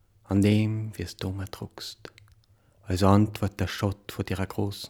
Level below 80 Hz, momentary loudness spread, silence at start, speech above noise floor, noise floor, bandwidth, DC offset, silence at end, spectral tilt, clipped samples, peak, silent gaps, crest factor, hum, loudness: -56 dBFS; 16 LU; 0.3 s; 35 dB; -61 dBFS; 17.5 kHz; under 0.1%; 0 s; -6.5 dB/octave; under 0.1%; -6 dBFS; none; 22 dB; none; -27 LUFS